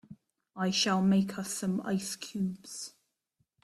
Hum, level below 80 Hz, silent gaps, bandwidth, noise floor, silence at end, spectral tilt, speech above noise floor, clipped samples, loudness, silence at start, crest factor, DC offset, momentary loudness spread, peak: none; -70 dBFS; none; 14 kHz; -78 dBFS; 0.75 s; -4.5 dB/octave; 48 dB; under 0.1%; -31 LUFS; 0.1 s; 18 dB; under 0.1%; 15 LU; -14 dBFS